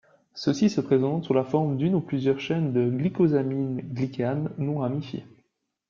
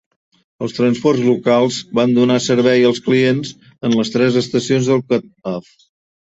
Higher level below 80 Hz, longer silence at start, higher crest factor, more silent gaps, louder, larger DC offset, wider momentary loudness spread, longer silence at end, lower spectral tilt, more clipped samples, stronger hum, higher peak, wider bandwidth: second, -64 dBFS vs -56 dBFS; second, 0.35 s vs 0.6 s; about the same, 16 dB vs 14 dB; neither; second, -26 LUFS vs -16 LUFS; neither; second, 8 LU vs 12 LU; second, 0.65 s vs 0.8 s; first, -8 dB/octave vs -5.5 dB/octave; neither; neither; second, -8 dBFS vs -2 dBFS; about the same, 7.4 kHz vs 8 kHz